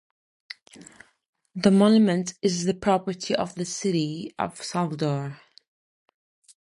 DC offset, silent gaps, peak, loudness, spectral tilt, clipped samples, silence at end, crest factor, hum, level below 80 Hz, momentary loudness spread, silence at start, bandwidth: under 0.1%; 1.29-1.33 s; -6 dBFS; -24 LUFS; -5.5 dB/octave; under 0.1%; 1.25 s; 20 dB; none; -62 dBFS; 21 LU; 0.8 s; 11.5 kHz